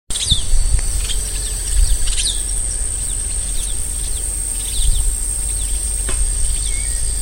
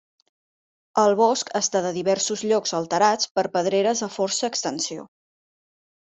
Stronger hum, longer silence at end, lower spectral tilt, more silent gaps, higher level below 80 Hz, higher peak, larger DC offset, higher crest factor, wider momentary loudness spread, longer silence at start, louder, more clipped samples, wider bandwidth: neither; second, 0 s vs 1 s; second, -1.5 dB/octave vs -3 dB/octave; second, none vs 3.31-3.35 s; first, -20 dBFS vs -70 dBFS; first, 0 dBFS vs -6 dBFS; neither; about the same, 18 dB vs 18 dB; second, 3 LU vs 7 LU; second, 0.1 s vs 0.95 s; first, -19 LUFS vs -22 LUFS; neither; first, 17 kHz vs 8.2 kHz